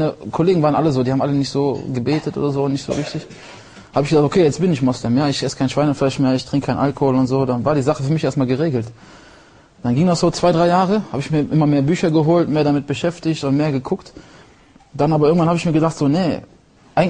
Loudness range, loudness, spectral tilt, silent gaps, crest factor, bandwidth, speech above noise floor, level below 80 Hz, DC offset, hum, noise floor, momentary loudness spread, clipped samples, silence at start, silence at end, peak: 3 LU; -18 LUFS; -7 dB/octave; none; 14 dB; 10 kHz; 31 dB; -48 dBFS; under 0.1%; none; -48 dBFS; 8 LU; under 0.1%; 0 s; 0 s; -2 dBFS